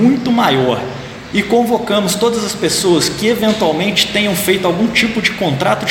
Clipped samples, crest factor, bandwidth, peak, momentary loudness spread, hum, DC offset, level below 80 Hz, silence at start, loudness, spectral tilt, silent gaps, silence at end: under 0.1%; 14 dB; 17 kHz; 0 dBFS; 4 LU; none; under 0.1%; -44 dBFS; 0 s; -14 LUFS; -4 dB/octave; none; 0 s